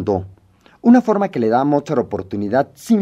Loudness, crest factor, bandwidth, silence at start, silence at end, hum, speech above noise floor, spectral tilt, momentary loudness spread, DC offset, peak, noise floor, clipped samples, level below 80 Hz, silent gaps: -17 LUFS; 16 dB; 13 kHz; 0 s; 0 s; none; 35 dB; -7.5 dB/octave; 10 LU; under 0.1%; -2 dBFS; -51 dBFS; under 0.1%; -54 dBFS; none